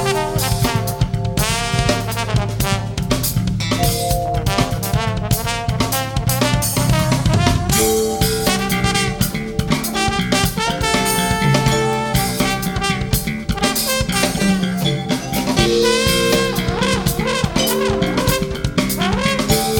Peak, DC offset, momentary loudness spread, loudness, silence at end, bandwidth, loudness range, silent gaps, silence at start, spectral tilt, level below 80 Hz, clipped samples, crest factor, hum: 0 dBFS; under 0.1%; 5 LU; -17 LUFS; 0 s; 18 kHz; 2 LU; none; 0 s; -4 dB/octave; -30 dBFS; under 0.1%; 18 dB; none